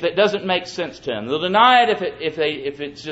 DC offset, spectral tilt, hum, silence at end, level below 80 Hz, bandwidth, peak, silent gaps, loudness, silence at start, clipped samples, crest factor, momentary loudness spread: under 0.1%; -4.5 dB/octave; none; 0 s; -58 dBFS; 8 kHz; -2 dBFS; none; -19 LUFS; 0 s; under 0.1%; 18 dB; 15 LU